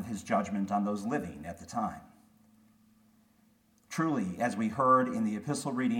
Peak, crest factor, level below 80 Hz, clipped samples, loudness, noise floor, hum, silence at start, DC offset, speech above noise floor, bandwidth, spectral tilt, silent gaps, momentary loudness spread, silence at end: -14 dBFS; 20 dB; -66 dBFS; under 0.1%; -31 LUFS; -67 dBFS; none; 0 s; under 0.1%; 36 dB; 16.5 kHz; -6 dB/octave; none; 13 LU; 0 s